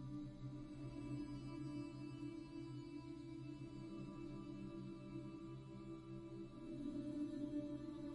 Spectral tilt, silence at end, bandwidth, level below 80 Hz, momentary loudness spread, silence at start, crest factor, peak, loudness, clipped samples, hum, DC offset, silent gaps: -8 dB/octave; 0 s; 11 kHz; -66 dBFS; 7 LU; 0 s; 14 dB; -36 dBFS; -51 LUFS; under 0.1%; none; under 0.1%; none